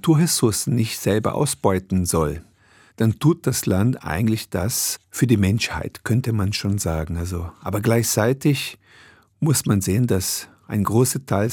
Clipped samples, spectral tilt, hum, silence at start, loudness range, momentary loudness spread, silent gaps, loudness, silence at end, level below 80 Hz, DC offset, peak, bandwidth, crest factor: under 0.1%; -5 dB/octave; none; 0.05 s; 1 LU; 8 LU; none; -21 LUFS; 0 s; -46 dBFS; under 0.1%; -2 dBFS; 19 kHz; 18 dB